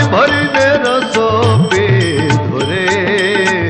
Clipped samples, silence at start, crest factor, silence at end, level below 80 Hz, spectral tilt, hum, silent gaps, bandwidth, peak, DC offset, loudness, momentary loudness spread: under 0.1%; 0 s; 10 dB; 0 s; -44 dBFS; -5.5 dB/octave; none; none; 9.8 kHz; -2 dBFS; under 0.1%; -12 LUFS; 3 LU